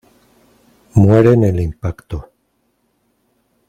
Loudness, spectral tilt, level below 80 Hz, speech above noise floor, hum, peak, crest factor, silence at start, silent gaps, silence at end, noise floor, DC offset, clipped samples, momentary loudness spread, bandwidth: -14 LUFS; -9.5 dB/octave; -38 dBFS; 52 dB; none; 0 dBFS; 16 dB; 0.95 s; none; 1.45 s; -64 dBFS; under 0.1%; under 0.1%; 19 LU; 9 kHz